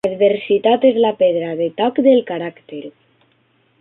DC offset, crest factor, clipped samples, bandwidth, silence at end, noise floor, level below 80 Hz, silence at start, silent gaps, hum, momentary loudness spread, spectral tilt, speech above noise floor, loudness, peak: under 0.1%; 14 dB; under 0.1%; 4.1 kHz; 0.9 s; -59 dBFS; -66 dBFS; 0.05 s; none; none; 16 LU; -7.5 dB/octave; 44 dB; -16 LUFS; -2 dBFS